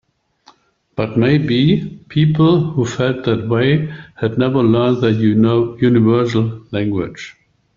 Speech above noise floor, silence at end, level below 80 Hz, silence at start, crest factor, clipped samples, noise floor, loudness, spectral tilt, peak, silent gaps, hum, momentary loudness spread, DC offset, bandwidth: 37 dB; 0.45 s; -48 dBFS; 0.95 s; 14 dB; under 0.1%; -51 dBFS; -15 LUFS; -8 dB/octave; -2 dBFS; none; none; 10 LU; under 0.1%; 7.4 kHz